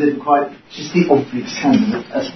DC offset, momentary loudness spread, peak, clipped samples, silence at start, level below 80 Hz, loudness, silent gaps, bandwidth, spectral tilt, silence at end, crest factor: under 0.1%; 10 LU; 0 dBFS; under 0.1%; 0 s; -58 dBFS; -17 LUFS; none; 6.2 kHz; -6 dB/octave; 0 s; 16 dB